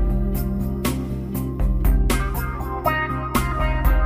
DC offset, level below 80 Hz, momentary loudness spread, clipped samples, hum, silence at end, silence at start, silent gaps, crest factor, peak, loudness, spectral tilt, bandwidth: under 0.1%; -22 dBFS; 6 LU; under 0.1%; none; 0 s; 0 s; none; 16 dB; -6 dBFS; -23 LUFS; -6 dB/octave; 15.5 kHz